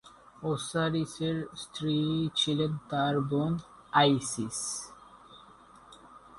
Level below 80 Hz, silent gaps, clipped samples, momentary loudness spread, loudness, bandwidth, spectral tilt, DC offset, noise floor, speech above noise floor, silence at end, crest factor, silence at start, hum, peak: -62 dBFS; none; under 0.1%; 11 LU; -30 LUFS; 11.5 kHz; -4.5 dB/octave; under 0.1%; -55 dBFS; 25 dB; 0 s; 22 dB; 0.05 s; none; -10 dBFS